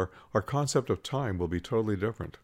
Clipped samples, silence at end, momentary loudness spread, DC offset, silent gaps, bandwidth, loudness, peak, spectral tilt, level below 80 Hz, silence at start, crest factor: under 0.1%; 0.15 s; 4 LU; under 0.1%; none; 16 kHz; -31 LUFS; -12 dBFS; -6 dB/octave; -56 dBFS; 0 s; 18 dB